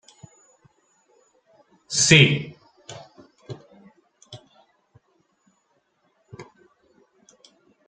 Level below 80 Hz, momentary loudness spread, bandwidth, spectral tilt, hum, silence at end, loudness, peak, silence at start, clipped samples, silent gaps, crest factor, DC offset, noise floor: -60 dBFS; 32 LU; 9.4 kHz; -3.5 dB/octave; none; 1.45 s; -17 LUFS; 0 dBFS; 1.9 s; under 0.1%; none; 28 dB; under 0.1%; -69 dBFS